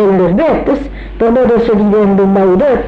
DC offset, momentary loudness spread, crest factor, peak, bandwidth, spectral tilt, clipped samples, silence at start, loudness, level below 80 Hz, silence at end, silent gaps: under 0.1%; 6 LU; 6 dB; -2 dBFS; 5.6 kHz; -9.5 dB/octave; under 0.1%; 0 s; -10 LUFS; -30 dBFS; 0 s; none